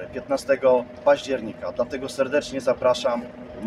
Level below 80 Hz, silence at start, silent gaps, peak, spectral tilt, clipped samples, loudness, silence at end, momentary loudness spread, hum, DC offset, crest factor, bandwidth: -54 dBFS; 0 s; none; -6 dBFS; -4.5 dB/octave; under 0.1%; -23 LUFS; 0 s; 8 LU; none; under 0.1%; 18 dB; 12.5 kHz